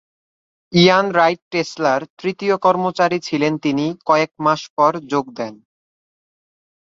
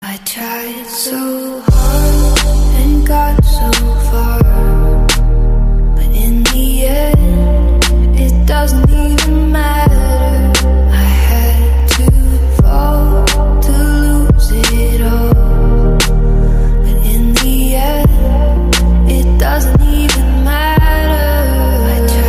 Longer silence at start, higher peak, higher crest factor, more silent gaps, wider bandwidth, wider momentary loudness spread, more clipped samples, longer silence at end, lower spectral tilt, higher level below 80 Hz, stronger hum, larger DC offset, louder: first, 0.7 s vs 0 s; about the same, -2 dBFS vs 0 dBFS; first, 18 dB vs 8 dB; first, 1.42-1.51 s, 2.10-2.17 s, 4.70-4.77 s vs none; second, 7.8 kHz vs 15.5 kHz; first, 9 LU vs 3 LU; neither; first, 1.35 s vs 0 s; about the same, -5.5 dB/octave vs -5 dB/octave; second, -62 dBFS vs -10 dBFS; neither; neither; second, -17 LUFS vs -12 LUFS